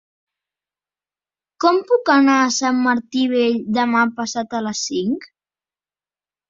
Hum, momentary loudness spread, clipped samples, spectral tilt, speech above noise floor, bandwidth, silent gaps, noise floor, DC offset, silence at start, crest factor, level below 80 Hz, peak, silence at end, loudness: 50 Hz at -60 dBFS; 10 LU; under 0.1%; -3.5 dB/octave; over 73 dB; 7.6 kHz; none; under -90 dBFS; under 0.1%; 1.6 s; 18 dB; -66 dBFS; -2 dBFS; 1.25 s; -18 LUFS